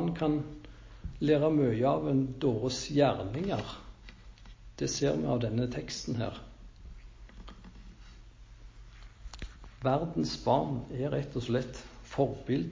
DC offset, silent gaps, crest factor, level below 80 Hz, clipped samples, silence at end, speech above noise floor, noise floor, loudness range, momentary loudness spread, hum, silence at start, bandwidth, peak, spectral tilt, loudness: under 0.1%; none; 20 dB; -50 dBFS; under 0.1%; 0 s; 21 dB; -52 dBFS; 13 LU; 24 LU; none; 0 s; 7.6 kHz; -12 dBFS; -6 dB/octave; -31 LUFS